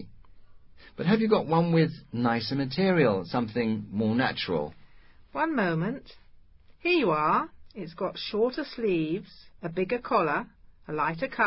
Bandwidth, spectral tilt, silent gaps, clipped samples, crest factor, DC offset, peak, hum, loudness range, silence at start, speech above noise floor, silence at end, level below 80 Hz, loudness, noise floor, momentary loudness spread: 5.8 kHz; -10.5 dB/octave; none; under 0.1%; 18 dB; under 0.1%; -10 dBFS; none; 4 LU; 0 s; 27 dB; 0 s; -58 dBFS; -27 LUFS; -53 dBFS; 13 LU